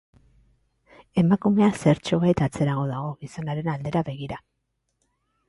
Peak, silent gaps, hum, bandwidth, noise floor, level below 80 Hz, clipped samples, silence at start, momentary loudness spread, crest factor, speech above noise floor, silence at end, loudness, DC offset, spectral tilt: -6 dBFS; none; none; 11.5 kHz; -75 dBFS; -54 dBFS; under 0.1%; 1.15 s; 14 LU; 18 dB; 52 dB; 1.1 s; -24 LUFS; under 0.1%; -7.5 dB/octave